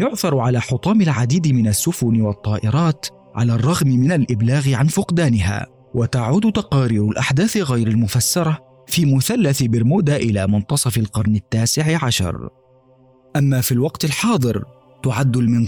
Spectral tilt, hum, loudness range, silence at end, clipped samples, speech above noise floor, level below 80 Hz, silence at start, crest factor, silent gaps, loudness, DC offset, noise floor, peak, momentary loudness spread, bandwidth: -5.5 dB/octave; none; 2 LU; 0 s; under 0.1%; 35 dB; -44 dBFS; 0 s; 10 dB; none; -18 LUFS; 0.1%; -52 dBFS; -8 dBFS; 6 LU; over 20 kHz